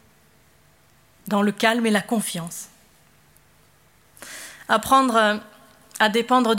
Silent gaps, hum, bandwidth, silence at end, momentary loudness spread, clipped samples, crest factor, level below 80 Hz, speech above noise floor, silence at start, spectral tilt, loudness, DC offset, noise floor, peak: none; none; 16.5 kHz; 0 s; 22 LU; under 0.1%; 20 dB; -60 dBFS; 37 dB; 1.25 s; -4 dB/octave; -21 LUFS; under 0.1%; -57 dBFS; -4 dBFS